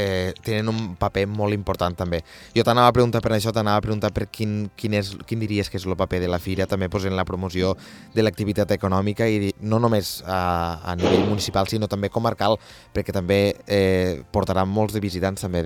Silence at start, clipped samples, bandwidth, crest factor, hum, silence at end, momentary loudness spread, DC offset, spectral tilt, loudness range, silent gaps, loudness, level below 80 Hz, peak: 0 s; under 0.1%; 18.5 kHz; 22 dB; none; 0 s; 7 LU; under 0.1%; -6 dB/octave; 3 LU; none; -23 LUFS; -46 dBFS; 0 dBFS